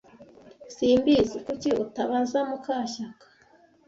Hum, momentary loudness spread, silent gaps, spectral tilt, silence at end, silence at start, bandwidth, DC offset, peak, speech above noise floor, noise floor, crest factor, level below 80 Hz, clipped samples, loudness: none; 14 LU; none; -5 dB/octave; 0.75 s; 0.2 s; 7.8 kHz; under 0.1%; -10 dBFS; 34 dB; -59 dBFS; 16 dB; -56 dBFS; under 0.1%; -26 LUFS